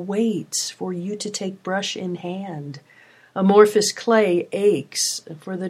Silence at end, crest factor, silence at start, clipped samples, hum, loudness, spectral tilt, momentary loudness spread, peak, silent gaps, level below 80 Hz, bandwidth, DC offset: 0 s; 22 dB; 0 s; under 0.1%; none; -21 LUFS; -4 dB/octave; 17 LU; 0 dBFS; none; -74 dBFS; 15.5 kHz; under 0.1%